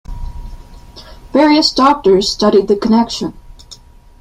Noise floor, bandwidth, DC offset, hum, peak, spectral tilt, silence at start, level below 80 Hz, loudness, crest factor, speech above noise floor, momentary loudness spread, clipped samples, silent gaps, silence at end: -39 dBFS; 12.5 kHz; under 0.1%; none; 0 dBFS; -4.5 dB/octave; 0.1 s; -32 dBFS; -12 LUFS; 14 dB; 28 dB; 21 LU; under 0.1%; none; 0.45 s